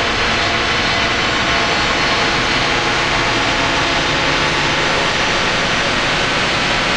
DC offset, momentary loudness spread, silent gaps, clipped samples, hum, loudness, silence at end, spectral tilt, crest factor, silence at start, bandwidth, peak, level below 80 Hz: under 0.1%; 1 LU; none; under 0.1%; none; -14 LUFS; 0 s; -3 dB/octave; 14 dB; 0 s; 12 kHz; -2 dBFS; -32 dBFS